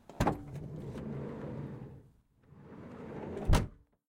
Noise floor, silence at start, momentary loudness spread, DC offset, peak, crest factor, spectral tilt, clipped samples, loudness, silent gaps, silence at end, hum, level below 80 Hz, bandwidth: -64 dBFS; 0.1 s; 20 LU; under 0.1%; -14 dBFS; 24 dB; -6.5 dB/octave; under 0.1%; -38 LUFS; none; 0.35 s; none; -42 dBFS; 16 kHz